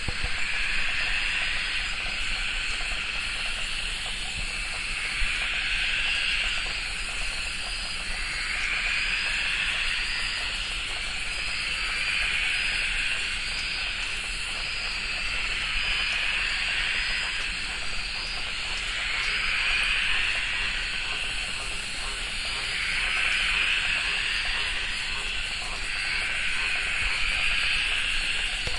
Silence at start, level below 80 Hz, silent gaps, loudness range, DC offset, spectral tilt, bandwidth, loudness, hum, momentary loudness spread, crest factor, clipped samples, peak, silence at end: 0 s; -38 dBFS; none; 2 LU; under 0.1%; -0.5 dB/octave; 11.5 kHz; -26 LUFS; none; 6 LU; 16 dB; under 0.1%; -12 dBFS; 0 s